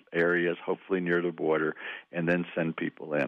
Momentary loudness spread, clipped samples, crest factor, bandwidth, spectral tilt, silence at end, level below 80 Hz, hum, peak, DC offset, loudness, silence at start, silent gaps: 8 LU; under 0.1%; 14 dB; 6.2 kHz; -8.5 dB/octave; 0 s; -72 dBFS; none; -16 dBFS; under 0.1%; -29 LUFS; 0.1 s; none